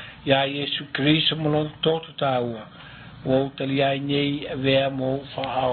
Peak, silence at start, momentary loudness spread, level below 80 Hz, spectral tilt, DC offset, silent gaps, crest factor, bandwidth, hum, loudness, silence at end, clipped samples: -6 dBFS; 0 s; 10 LU; -54 dBFS; -10.5 dB/octave; under 0.1%; none; 18 dB; 4.6 kHz; none; -23 LUFS; 0 s; under 0.1%